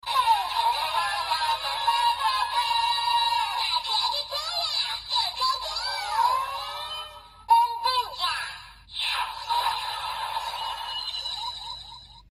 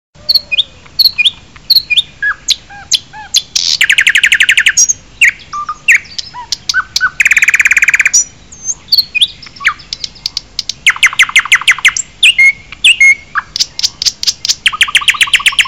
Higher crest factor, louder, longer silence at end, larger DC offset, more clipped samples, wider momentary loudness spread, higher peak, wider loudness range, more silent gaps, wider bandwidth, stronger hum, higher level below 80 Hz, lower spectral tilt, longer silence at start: first, 18 dB vs 12 dB; second, -25 LUFS vs -8 LUFS; about the same, 0.1 s vs 0 s; second, under 0.1% vs 0.5%; second, under 0.1% vs 0.2%; about the same, 10 LU vs 12 LU; second, -8 dBFS vs 0 dBFS; about the same, 5 LU vs 4 LU; neither; second, 15 kHz vs over 20 kHz; neither; second, -56 dBFS vs -44 dBFS; first, 1 dB/octave vs 3 dB/octave; second, 0.05 s vs 0.3 s